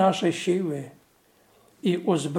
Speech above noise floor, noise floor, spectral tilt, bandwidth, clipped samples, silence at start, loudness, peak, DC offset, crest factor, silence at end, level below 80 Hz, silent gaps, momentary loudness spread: 37 dB; -61 dBFS; -5.5 dB/octave; 15 kHz; under 0.1%; 0 s; -26 LUFS; -8 dBFS; under 0.1%; 18 dB; 0 s; -76 dBFS; none; 11 LU